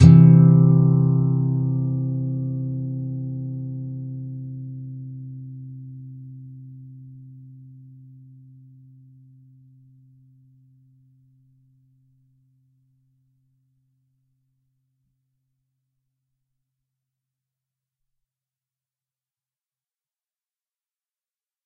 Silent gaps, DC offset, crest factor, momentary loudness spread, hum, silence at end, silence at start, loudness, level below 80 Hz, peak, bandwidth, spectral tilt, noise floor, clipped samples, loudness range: none; under 0.1%; 24 dB; 28 LU; none; 14.75 s; 0 s; -19 LUFS; -50 dBFS; 0 dBFS; 4.8 kHz; -10.5 dB/octave; under -90 dBFS; under 0.1%; 27 LU